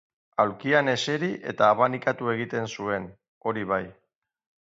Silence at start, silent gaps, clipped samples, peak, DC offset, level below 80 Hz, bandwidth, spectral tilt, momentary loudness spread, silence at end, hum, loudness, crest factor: 0.4 s; 3.28-3.41 s; under 0.1%; -6 dBFS; under 0.1%; -64 dBFS; 7.8 kHz; -5 dB/octave; 11 LU; 0.75 s; none; -26 LUFS; 20 dB